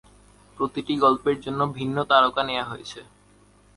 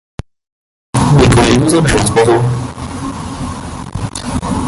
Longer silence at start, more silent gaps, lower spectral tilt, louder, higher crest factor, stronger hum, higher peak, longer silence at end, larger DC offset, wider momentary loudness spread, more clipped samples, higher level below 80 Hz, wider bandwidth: second, 0.6 s vs 0.95 s; neither; about the same, -5.5 dB/octave vs -5.5 dB/octave; second, -23 LUFS vs -13 LUFS; first, 22 dB vs 14 dB; first, 50 Hz at -55 dBFS vs none; second, -4 dBFS vs 0 dBFS; first, 0.75 s vs 0 s; neither; about the same, 16 LU vs 15 LU; neither; second, -56 dBFS vs -26 dBFS; about the same, 11.5 kHz vs 12 kHz